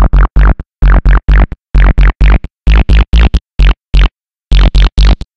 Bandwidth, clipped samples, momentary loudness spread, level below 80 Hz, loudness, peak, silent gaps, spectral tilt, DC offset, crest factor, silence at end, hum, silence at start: 6 kHz; under 0.1%; 4 LU; -6 dBFS; -11 LUFS; 0 dBFS; none; -7 dB/octave; 3%; 6 dB; 0.2 s; none; 0 s